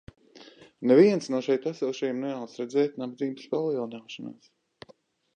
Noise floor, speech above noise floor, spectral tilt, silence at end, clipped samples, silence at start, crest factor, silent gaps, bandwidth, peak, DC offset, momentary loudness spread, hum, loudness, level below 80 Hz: -60 dBFS; 34 dB; -6.5 dB/octave; 1.05 s; under 0.1%; 0.35 s; 20 dB; none; 9.2 kHz; -8 dBFS; under 0.1%; 18 LU; none; -27 LUFS; -70 dBFS